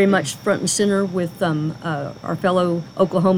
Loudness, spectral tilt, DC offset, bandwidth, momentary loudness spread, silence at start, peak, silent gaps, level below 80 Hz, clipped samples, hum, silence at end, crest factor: -21 LUFS; -5 dB/octave; under 0.1%; 16 kHz; 8 LU; 0 s; -4 dBFS; none; -56 dBFS; under 0.1%; none; 0 s; 14 dB